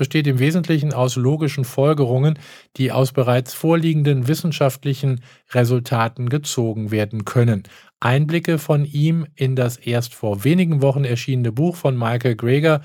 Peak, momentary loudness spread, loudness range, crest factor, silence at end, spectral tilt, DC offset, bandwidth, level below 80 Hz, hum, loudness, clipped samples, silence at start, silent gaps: -2 dBFS; 5 LU; 2 LU; 16 dB; 0 s; -6.5 dB/octave; under 0.1%; 17.5 kHz; -62 dBFS; none; -19 LUFS; under 0.1%; 0 s; none